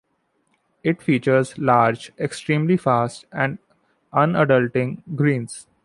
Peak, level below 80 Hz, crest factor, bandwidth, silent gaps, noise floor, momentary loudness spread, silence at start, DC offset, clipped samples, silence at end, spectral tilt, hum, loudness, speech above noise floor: -2 dBFS; -62 dBFS; 18 dB; 11.5 kHz; none; -68 dBFS; 10 LU; 0.85 s; under 0.1%; under 0.1%; 0.25 s; -7 dB/octave; none; -21 LUFS; 49 dB